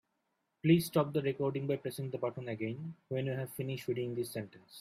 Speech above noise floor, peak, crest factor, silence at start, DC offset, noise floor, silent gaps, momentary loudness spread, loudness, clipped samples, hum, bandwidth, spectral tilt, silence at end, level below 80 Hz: 47 dB; -14 dBFS; 22 dB; 0.65 s; under 0.1%; -82 dBFS; none; 11 LU; -35 LUFS; under 0.1%; none; 16 kHz; -6.5 dB/octave; 0 s; -74 dBFS